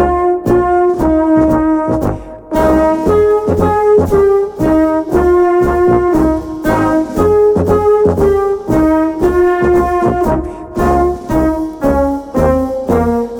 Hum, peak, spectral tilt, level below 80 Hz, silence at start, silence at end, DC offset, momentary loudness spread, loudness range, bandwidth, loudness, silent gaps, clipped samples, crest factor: none; 0 dBFS; -8 dB/octave; -26 dBFS; 0 s; 0 s; under 0.1%; 5 LU; 2 LU; 18 kHz; -12 LUFS; none; under 0.1%; 10 dB